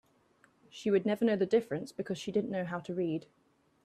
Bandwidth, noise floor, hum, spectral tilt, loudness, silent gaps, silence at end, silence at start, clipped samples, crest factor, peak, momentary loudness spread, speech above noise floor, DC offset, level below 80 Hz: 14 kHz; -68 dBFS; none; -6.5 dB/octave; -33 LUFS; none; 0.65 s; 0.75 s; under 0.1%; 18 dB; -16 dBFS; 10 LU; 35 dB; under 0.1%; -74 dBFS